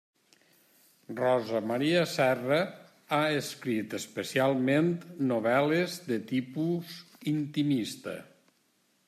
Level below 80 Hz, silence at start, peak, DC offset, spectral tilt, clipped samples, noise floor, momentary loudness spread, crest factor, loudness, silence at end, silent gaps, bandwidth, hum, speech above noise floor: -76 dBFS; 1.1 s; -12 dBFS; under 0.1%; -5.5 dB/octave; under 0.1%; -71 dBFS; 11 LU; 18 dB; -29 LUFS; 0.85 s; none; 15 kHz; none; 42 dB